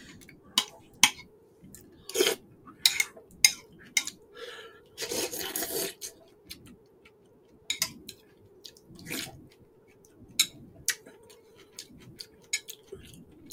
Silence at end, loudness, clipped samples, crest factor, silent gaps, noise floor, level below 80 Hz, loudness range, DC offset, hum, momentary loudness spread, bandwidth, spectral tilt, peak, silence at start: 0.05 s; -29 LUFS; under 0.1%; 34 dB; none; -59 dBFS; -68 dBFS; 11 LU; under 0.1%; none; 25 LU; 18 kHz; 0 dB/octave; 0 dBFS; 0 s